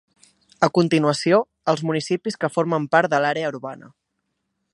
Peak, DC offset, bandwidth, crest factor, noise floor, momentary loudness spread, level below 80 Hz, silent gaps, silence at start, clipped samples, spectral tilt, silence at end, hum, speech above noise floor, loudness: 0 dBFS; under 0.1%; 11.5 kHz; 22 dB; -76 dBFS; 9 LU; -68 dBFS; none; 0.6 s; under 0.1%; -5.5 dB/octave; 0.85 s; none; 55 dB; -21 LUFS